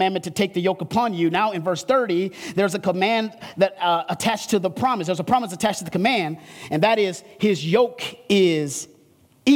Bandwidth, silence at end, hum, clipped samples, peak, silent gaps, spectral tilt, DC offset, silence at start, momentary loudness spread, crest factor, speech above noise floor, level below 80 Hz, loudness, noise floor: 17.5 kHz; 0 s; none; under 0.1%; -4 dBFS; none; -5 dB/octave; under 0.1%; 0 s; 6 LU; 16 dB; 34 dB; -62 dBFS; -22 LUFS; -56 dBFS